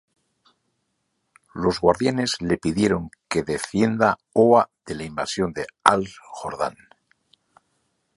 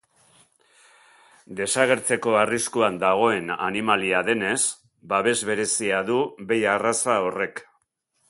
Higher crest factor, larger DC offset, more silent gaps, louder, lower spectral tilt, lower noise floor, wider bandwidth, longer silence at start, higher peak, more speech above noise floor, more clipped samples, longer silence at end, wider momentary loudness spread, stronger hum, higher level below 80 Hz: about the same, 24 dB vs 20 dB; neither; neither; about the same, -22 LUFS vs -22 LUFS; first, -5 dB/octave vs -3 dB/octave; about the same, -74 dBFS vs -71 dBFS; about the same, 11.5 kHz vs 11.5 kHz; about the same, 1.55 s vs 1.5 s; first, 0 dBFS vs -4 dBFS; first, 52 dB vs 48 dB; neither; first, 1.45 s vs 0.65 s; first, 12 LU vs 6 LU; neither; first, -50 dBFS vs -64 dBFS